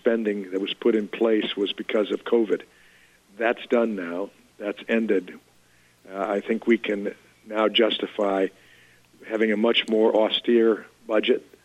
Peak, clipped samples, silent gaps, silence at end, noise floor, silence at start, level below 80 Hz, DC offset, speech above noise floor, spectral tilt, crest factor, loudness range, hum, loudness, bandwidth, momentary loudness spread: -8 dBFS; under 0.1%; none; 0.25 s; -58 dBFS; 0.05 s; -72 dBFS; under 0.1%; 35 dB; -5.5 dB/octave; 16 dB; 4 LU; 60 Hz at -65 dBFS; -24 LUFS; 10.5 kHz; 12 LU